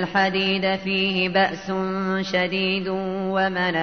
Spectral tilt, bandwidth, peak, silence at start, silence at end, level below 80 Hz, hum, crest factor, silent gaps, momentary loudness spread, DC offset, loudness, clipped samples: -6 dB/octave; 6.6 kHz; -8 dBFS; 0 s; 0 s; -58 dBFS; none; 14 dB; none; 5 LU; 0.2%; -22 LUFS; under 0.1%